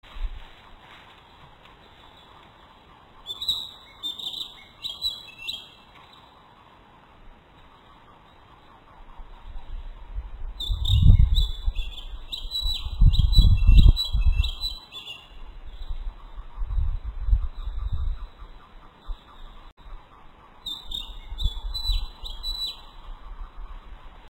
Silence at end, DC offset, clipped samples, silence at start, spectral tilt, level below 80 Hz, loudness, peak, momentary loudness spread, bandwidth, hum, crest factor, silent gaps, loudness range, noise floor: 0.05 s; under 0.1%; under 0.1%; 0.15 s; -5.5 dB/octave; -26 dBFS; -26 LUFS; -2 dBFS; 28 LU; 16 kHz; none; 24 dB; 19.72-19.77 s; 16 LU; -52 dBFS